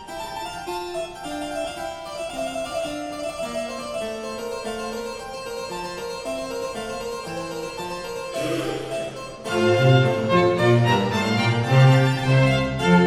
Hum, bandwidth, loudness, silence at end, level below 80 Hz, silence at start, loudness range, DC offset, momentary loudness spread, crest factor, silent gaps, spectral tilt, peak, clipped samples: none; 14 kHz; -23 LUFS; 0 s; -48 dBFS; 0 s; 11 LU; under 0.1%; 14 LU; 18 dB; none; -6 dB/octave; -6 dBFS; under 0.1%